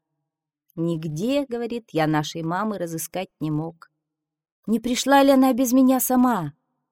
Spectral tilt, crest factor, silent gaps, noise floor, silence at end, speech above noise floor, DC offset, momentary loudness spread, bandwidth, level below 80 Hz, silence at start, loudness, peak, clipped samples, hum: -5 dB/octave; 18 dB; 4.52-4.63 s; -83 dBFS; 0.4 s; 62 dB; under 0.1%; 12 LU; 18 kHz; -58 dBFS; 0.75 s; -22 LUFS; -4 dBFS; under 0.1%; none